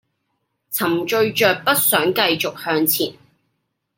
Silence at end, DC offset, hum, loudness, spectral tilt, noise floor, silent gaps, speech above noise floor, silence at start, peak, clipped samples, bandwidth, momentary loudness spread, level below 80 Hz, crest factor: 0.85 s; under 0.1%; none; -18 LUFS; -2.5 dB/octave; -73 dBFS; none; 54 dB; 0.7 s; -2 dBFS; under 0.1%; 17 kHz; 7 LU; -66 dBFS; 20 dB